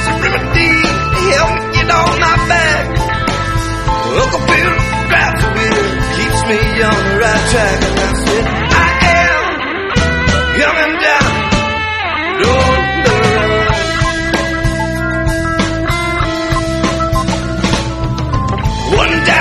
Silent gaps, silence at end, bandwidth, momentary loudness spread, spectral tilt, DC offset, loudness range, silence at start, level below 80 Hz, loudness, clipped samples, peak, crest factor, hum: none; 0 s; 14.5 kHz; 6 LU; -4.5 dB/octave; under 0.1%; 3 LU; 0 s; -22 dBFS; -12 LUFS; under 0.1%; 0 dBFS; 12 dB; none